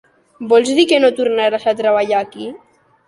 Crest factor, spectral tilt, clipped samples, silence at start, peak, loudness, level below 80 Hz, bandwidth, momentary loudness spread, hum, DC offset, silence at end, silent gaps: 14 dB; -3.5 dB/octave; under 0.1%; 0.4 s; -2 dBFS; -14 LUFS; -62 dBFS; 11.5 kHz; 17 LU; none; under 0.1%; 0.5 s; none